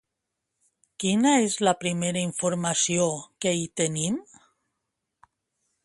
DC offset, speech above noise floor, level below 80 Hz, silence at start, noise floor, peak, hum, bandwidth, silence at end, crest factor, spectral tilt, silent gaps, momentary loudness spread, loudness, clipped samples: under 0.1%; 58 dB; -66 dBFS; 1 s; -83 dBFS; -8 dBFS; none; 11.5 kHz; 1.65 s; 20 dB; -4 dB/octave; none; 8 LU; -25 LUFS; under 0.1%